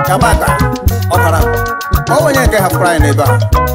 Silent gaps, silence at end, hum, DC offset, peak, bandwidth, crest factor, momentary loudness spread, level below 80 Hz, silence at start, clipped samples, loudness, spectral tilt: none; 0 s; none; under 0.1%; -2 dBFS; 16.5 kHz; 10 dB; 4 LU; -18 dBFS; 0 s; under 0.1%; -11 LUFS; -5.5 dB/octave